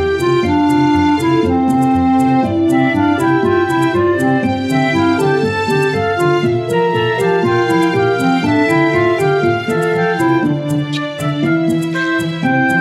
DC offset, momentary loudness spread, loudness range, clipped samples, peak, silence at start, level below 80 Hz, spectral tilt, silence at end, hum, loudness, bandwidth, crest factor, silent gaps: under 0.1%; 4 LU; 2 LU; under 0.1%; -2 dBFS; 0 s; -44 dBFS; -6.5 dB/octave; 0 s; none; -14 LUFS; 14.5 kHz; 12 dB; none